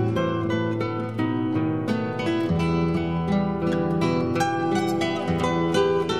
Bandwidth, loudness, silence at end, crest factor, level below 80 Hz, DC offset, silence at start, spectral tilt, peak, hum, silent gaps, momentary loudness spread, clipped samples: 13 kHz; -24 LUFS; 0 s; 14 dB; -48 dBFS; 0.3%; 0 s; -7 dB/octave; -8 dBFS; none; none; 3 LU; under 0.1%